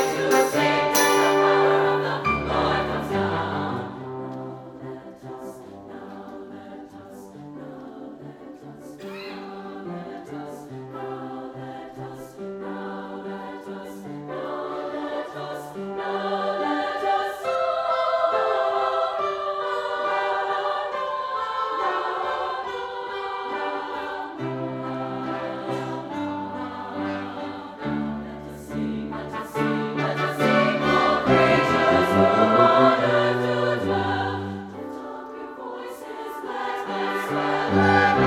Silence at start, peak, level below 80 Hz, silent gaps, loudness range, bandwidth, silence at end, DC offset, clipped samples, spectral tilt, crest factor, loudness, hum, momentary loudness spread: 0 s; -4 dBFS; -54 dBFS; none; 18 LU; 18 kHz; 0 s; under 0.1%; under 0.1%; -5 dB/octave; 20 dB; -24 LUFS; none; 20 LU